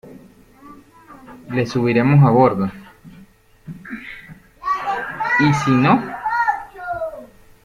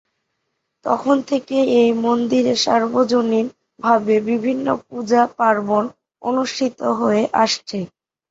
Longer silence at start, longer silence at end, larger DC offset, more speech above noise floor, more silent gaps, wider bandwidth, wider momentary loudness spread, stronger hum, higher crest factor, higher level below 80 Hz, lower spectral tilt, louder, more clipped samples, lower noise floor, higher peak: second, 0.05 s vs 0.85 s; about the same, 0.4 s vs 0.45 s; neither; second, 33 dB vs 57 dB; neither; first, 9.8 kHz vs 8 kHz; first, 20 LU vs 9 LU; neither; about the same, 18 dB vs 16 dB; first, -52 dBFS vs -62 dBFS; first, -7.5 dB/octave vs -4.5 dB/octave; about the same, -18 LUFS vs -18 LUFS; neither; second, -47 dBFS vs -74 dBFS; about the same, -2 dBFS vs -2 dBFS